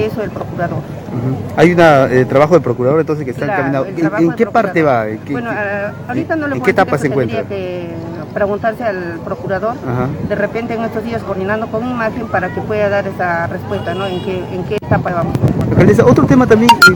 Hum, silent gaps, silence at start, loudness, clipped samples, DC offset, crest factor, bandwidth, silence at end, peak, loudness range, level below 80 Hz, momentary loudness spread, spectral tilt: none; none; 0 s; -14 LUFS; 0.2%; under 0.1%; 14 dB; 19 kHz; 0 s; 0 dBFS; 6 LU; -40 dBFS; 12 LU; -6.5 dB/octave